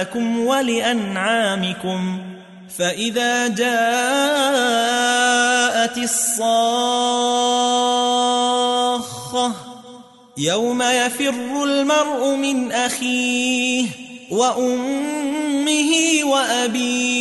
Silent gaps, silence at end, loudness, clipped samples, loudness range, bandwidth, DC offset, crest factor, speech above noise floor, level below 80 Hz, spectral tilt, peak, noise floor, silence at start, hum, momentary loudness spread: none; 0 s; -18 LUFS; under 0.1%; 3 LU; 12 kHz; under 0.1%; 16 dB; 24 dB; -66 dBFS; -2.5 dB/octave; -4 dBFS; -42 dBFS; 0 s; none; 7 LU